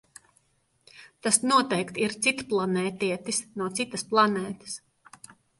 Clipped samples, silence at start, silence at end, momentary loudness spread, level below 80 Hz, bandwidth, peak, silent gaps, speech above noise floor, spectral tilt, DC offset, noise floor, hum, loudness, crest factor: under 0.1%; 0.95 s; 0.85 s; 11 LU; -68 dBFS; 12 kHz; -4 dBFS; none; 41 dB; -3 dB/octave; under 0.1%; -68 dBFS; none; -26 LUFS; 24 dB